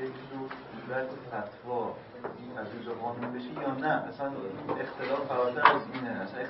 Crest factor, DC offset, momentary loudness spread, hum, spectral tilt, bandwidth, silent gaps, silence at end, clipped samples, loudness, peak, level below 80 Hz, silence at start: 28 dB; under 0.1%; 16 LU; none; -3.5 dB/octave; 5.6 kHz; none; 0 s; under 0.1%; -33 LUFS; -4 dBFS; -70 dBFS; 0 s